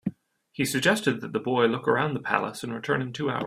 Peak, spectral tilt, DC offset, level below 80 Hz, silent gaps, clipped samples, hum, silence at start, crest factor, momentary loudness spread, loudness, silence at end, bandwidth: -4 dBFS; -4.5 dB/octave; under 0.1%; -64 dBFS; none; under 0.1%; none; 0.05 s; 24 dB; 10 LU; -26 LUFS; 0 s; 16 kHz